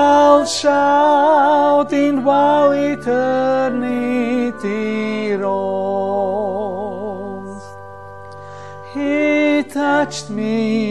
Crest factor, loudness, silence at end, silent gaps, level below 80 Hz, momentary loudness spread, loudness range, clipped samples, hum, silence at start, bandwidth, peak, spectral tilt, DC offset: 16 dB; -16 LUFS; 0 s; none; -54 dBFS; 21 LU; 9 LU; under 0.1%; none; 0 s; 12 kHz; 0 dBFS; -5 dB/octave; 0.7%